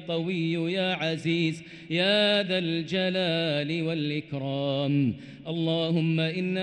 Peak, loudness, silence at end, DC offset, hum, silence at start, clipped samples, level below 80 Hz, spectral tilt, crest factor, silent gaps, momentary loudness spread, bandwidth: -14 dBFS; -27 LUFS; 0 s; under 0.1%; none; 0 s; under 0.1%; -68 dBFS; -6.5 dB/octave; 14 dB; none; 7 LU; 9.4 kHz